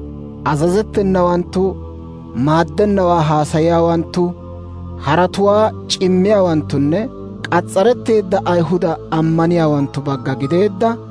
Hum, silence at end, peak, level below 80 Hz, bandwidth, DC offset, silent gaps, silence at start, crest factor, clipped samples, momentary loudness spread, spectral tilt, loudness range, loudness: none; 0 s; -2 dBFS; -38 dBFS; 11 kHz; under 0.1%; none; 0 s; 14 dB; under 0.1%; 12 LU; -7 dB/octave; 1 LU; -15 LUFS